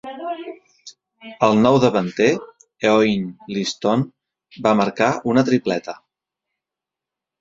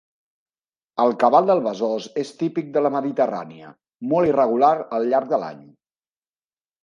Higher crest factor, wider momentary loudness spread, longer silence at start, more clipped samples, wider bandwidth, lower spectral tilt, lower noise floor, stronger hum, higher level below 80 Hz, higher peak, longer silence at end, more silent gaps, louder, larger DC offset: about the same, 20 dB vs 20 dB; about the same, 15 LU vs 13 LU; second, 0.05 s vs 0.95 s; neither; second, 7.8 kHz vs 10.5 kHz; about the same, -6 dB/octave vs -7 dB/octave; about the same, -87 dBFS vs under -90 dBFS; neither; first, -60 dBFS vs -66 dBFS; about the same, 0 dBFS vs -2 dBFS; first, 1.45 s vs 1.25 s; neither; about the same, -19 LUFS vs -20 LUFS; neither